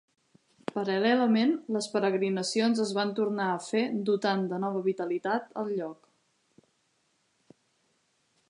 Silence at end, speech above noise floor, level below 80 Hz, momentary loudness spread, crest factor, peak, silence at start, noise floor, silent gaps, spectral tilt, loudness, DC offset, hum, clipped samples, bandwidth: 2.55 s; 45 dB; -84 dBFS; 9 LU; 16 dB; -14 dBFS; 0.75 s; -73 dBFS; none; -5 dB/octave; -29 LUFS; under 0.1%; none; under 0.1%; 11 kHz